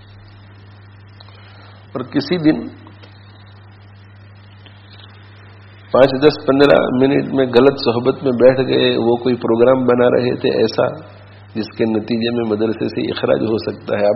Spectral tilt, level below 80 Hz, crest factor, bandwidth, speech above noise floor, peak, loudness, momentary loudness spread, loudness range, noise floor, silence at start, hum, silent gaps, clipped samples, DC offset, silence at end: -5 dB/octave; -50 dBFS; 16 dB; 6 kHz; 26 dB; 0 dBFS; -15 LUFS; 10 LU; 10 LU; -41 dBFS; 1.7 s; none; none; under 0.1%; under 0.1%; 0 s